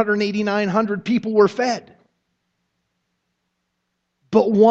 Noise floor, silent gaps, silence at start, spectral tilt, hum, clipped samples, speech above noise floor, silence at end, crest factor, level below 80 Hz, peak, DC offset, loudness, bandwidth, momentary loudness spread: -75 dBFS; none; 0 s; -6.5 dB/octave; none; under 0.1%; 57 dB; 0 s; 18 dB; -66 dBFS; -2 dBFS; under 0.1%; -19 LUFS; 7.8 kHz; 6 LU